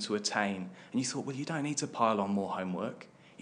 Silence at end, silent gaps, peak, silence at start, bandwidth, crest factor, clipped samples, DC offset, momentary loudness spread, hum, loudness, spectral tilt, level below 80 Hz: 0.1 s; none; -14 dBFS; 0 s; 10.5 kHz; 20 dB; under 0.1%; under 0.1%; 11 LU; none; -33 LUFS; -4 dB/octave; -86 dBFS